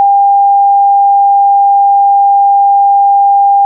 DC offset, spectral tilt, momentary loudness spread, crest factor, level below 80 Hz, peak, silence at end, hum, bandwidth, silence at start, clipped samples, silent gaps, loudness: under 0.1%; 4.5 dB/octave; 0 LU; 4 dB; under -90 dBFS; -4 dBFS; 0 s; none; 1 kHz; 0 s; under 0.1%; none; -7 LUFS